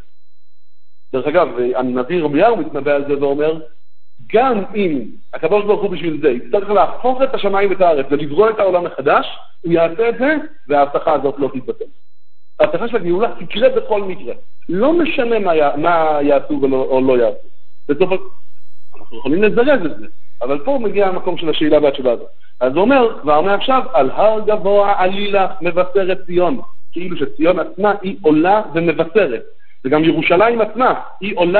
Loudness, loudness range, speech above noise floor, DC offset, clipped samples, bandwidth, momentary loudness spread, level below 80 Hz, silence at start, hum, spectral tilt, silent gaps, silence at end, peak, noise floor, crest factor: -16 LUFS; 4 LU; 55 dB; 7%; under 0.1%; 4.5 kHz; 10 LU; -50 dBFS; 0 s; none; -10.5 dB/octave; none; 0 s; 0 dBFS; -70 dBFS; 16 dB